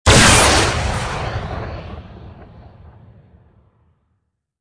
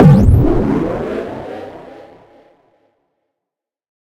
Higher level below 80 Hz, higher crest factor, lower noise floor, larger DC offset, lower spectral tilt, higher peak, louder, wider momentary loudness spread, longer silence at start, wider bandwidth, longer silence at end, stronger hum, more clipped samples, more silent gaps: about the same, -28 dBFS vs -24 dBFS; about the same, 18 dB vs 16 dB; second, -70 dBFS vs -84 dBFS; neither; second, -3 dB/octave vs -10 dB/octave; about the same, 0 dBFS vs 0 dBFS; about the same, -14 LUFS vs -14 LUFS; about the same, 24 LU vs 24 LU; about the same, 0.05 s vs 0 s; about the same, 11 kHz vs 11 kHz; second, 2 s vs 2.3 s; neither; second, under 0.1% vs 0.3%; neither